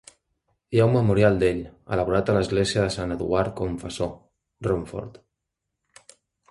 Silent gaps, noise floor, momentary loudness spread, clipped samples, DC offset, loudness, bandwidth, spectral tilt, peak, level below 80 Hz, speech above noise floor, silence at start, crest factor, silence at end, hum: none; -82 dBFS; 13 LU; under 0.1%; under 0.1%; -24 LUFS; 11.5 kHz; -6.5 dB/octave; -4 dBFS; -44 dBFS; 59 dB; 0.7 s; 20 dB; 1.4 s; none